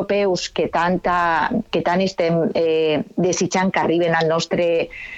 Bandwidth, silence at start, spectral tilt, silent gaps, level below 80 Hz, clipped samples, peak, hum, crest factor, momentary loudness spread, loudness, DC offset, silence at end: 8.2 kHz; 0 s; -5 dB/octave; none; -48 dBFS; under 0.1%; -4 dBFS; none; 14 dB; 3 LU; -19 LUFS; under 0.1%; 0 s